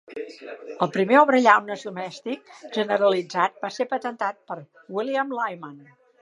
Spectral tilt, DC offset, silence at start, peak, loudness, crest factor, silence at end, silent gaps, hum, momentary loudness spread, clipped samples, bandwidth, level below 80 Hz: -5 dB/octave; under 0.1%; 0.1 s; -2 dBFS; -23 LUFS; 22 dB; 0.45 s; none; none; 20 LU; under 0.1%; 11 kHz; -80 dBFS